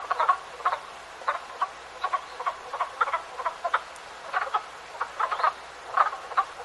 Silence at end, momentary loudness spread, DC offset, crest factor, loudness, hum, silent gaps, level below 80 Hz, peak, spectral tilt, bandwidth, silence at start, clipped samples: 0 s; 10 LU; under 0.1%; 24 dB; -29 LUFS; none; none; -66 dBFS; -6 dBFS; -1 dB/octave; 11.5 kHz; 0 s; under 0.1%